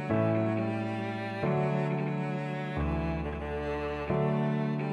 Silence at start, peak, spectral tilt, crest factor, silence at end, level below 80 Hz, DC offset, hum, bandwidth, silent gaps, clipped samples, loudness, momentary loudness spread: 0 s; -14 dBFS; -9 dB/octave; 16 dB; 0 s; -44 dBFS; under 0.1%; none; 8.4 kHz; none; under 0.1%; -31 LUFS; 6 LU